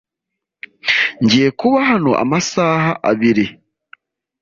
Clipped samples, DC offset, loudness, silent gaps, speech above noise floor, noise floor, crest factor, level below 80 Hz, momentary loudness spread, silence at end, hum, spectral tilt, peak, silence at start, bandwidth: under 0.1%; under 0.1%; -15 LUFS; none; 66 dB; -80 dBFS; 14 dB; -54 dBFS; 4 LU; 0.9 s; none; -5 dB/octave; -2 dBFS; 0.85 s; 7.6 kHz